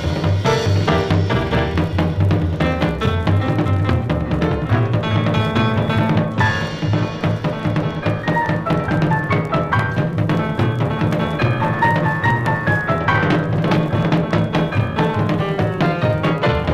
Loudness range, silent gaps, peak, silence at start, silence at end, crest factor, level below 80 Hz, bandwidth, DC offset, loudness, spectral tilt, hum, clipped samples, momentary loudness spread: 2 LU; none; -2 dBFS; 0 s; 0 s; 14 dB; -34 dBFS; 10.5 kHz; 0.2%; -18 LUFS; -7.5 dB/octave; none; under 0.1%; 3 LU